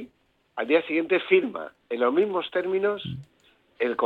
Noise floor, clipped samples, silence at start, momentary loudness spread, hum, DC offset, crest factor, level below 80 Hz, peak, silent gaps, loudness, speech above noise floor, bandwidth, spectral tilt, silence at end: -65 dBFS; under 0.1%; 0 s; 15 LU; none; under 0.1%; 20 dB; -70 dBFS; -6 dBFS; none; -25 LUFS; 41 dB; 4.5 kHz; -7.5 dB/octave; 0 s